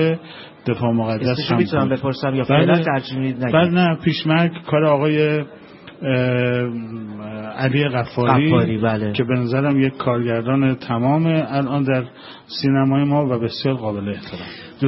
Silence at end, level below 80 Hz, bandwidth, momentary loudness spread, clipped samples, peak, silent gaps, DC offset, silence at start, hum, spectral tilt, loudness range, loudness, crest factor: 0 s; -54 dBFS; 5.8 kHz; 13 LU; under 0.1%; 0 dBFS; none; under 0.1%; 0 s; none; -11.5 dB/octave; 3 LU; -19 LUFS; 18 dB